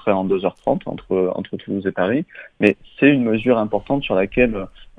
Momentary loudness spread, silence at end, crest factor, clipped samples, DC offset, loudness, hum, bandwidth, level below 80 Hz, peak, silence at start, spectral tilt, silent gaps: 8 LU; 0.15 s; 20 dB; under 0.1%; under 0.1%; -19 LUFS; none; 4.8 kHz; -44 dBFS; 0 dBFS; 0.05 s; -8.5 dB/octave; none